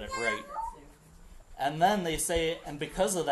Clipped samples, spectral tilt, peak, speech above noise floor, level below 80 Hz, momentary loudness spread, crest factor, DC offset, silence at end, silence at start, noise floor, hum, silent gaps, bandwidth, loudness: under 0.1%; -3.5 dB/octave; -12 dBFS; 24 dB; -50 dBFS; 12 LU; 18 dB; under 0.1%; 0 s; 0 s; -53 dBFS; none; none; 12.5 kHz; -31 LUFS